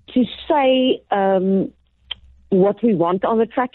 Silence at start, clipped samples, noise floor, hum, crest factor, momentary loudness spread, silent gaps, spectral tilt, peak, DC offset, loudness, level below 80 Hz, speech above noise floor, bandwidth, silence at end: 0.1 s; under 0.1%; -37 dBFS; none; 12 dB; 16 LU; none; -10.5 dB/octave; -8 dBFS; under 0.1%; -18 LUFS; -54 dBFS; 20 dB; 4.2 kHz; 0.05 s